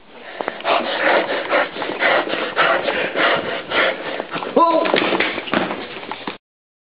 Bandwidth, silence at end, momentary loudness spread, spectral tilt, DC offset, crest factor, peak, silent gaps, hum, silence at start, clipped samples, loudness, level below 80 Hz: 5.4 kHz; 0.5 s; 12 LU; -0.5 dB/octave; 0.4%; 18 dB; 0 dBFS; none; none; 0.1 s; under 0.1%; -18 LUFS; -62 dBFS